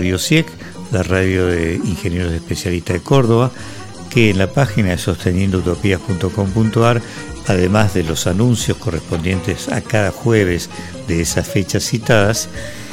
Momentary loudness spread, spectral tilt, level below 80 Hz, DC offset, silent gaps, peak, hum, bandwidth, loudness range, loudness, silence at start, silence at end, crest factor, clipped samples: 8 LU; -5.5 dB/octave; -36 dBFS; under 0.1%; none; 0 dBFS; none; 16.5 kHz; 2 LU; -17 LUFS; 0 s; 0 s; 16 dB; under 0.1%